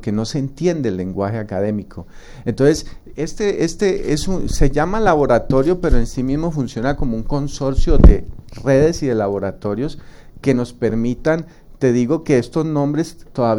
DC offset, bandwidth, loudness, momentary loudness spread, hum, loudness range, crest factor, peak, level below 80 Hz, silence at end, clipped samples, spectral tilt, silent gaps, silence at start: under 0.1%; 12 kHz; -19 LUFS; 10 LU; none; 3 LU; 16 dB; 0 dBFS; -22 dBFS; 0 s; under 0.1%; -6.5 dB/octave; none; 0 s